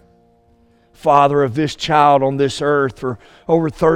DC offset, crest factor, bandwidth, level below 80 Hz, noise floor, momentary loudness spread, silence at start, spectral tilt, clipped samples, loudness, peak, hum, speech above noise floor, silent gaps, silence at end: under 0.1%; 16 dB; 12 kHz; -48 dBFS; -54 dBFS; 10 LU; 1.05 s; -6 dB/octave; under 0.1%; -16 LUFS; 0 dBFS; none; 39 dB; none; 0 s